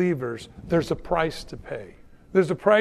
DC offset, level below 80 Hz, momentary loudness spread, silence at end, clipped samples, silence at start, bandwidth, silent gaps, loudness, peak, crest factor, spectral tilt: under 0.1%; -46 dBFS; 15 LU; 0 s; under 0.1%; 0 s; 13.5 kHz; none; -25 LUFS; -4 dBFS; 20 dB; -6.5 dB/octave